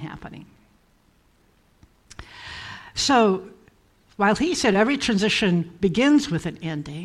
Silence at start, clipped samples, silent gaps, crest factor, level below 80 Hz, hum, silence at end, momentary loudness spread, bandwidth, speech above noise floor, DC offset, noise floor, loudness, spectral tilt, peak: 0 s; under 0.1%; none; 16 dB; -52 dBFS; none; 0 s; 19 LU; 12.5 kHz; 39 dB; under 0.1%; -60 dBFS; -21 LUFS; -4.5 dB/octave; -8 dBFS